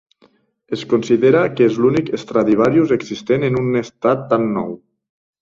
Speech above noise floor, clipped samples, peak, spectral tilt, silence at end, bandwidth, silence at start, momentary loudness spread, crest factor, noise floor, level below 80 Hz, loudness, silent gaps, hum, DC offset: 40 dB; under 0.1%; -2 dBFS; -7.5 dB/octave; 0.65 s; 7.6 kHz; 0.7 s; 9 LU; 16 dB; -56 dBFS; -54 dBFS; -17 LUFS; none; none; under 0.1%